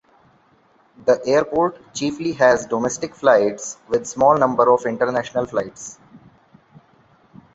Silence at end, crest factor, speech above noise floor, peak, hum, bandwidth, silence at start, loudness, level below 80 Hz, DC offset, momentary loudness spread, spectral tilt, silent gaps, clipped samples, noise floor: 1.4 s; 20 dB; 38 dB; -2 dBFS; none; 8 kHz; 1.05 s; -19 LUFS; -58 dBFS; under 0.1%; 10 LU; -4.5 dB/octave; none; under 0.1%; -57 dBFS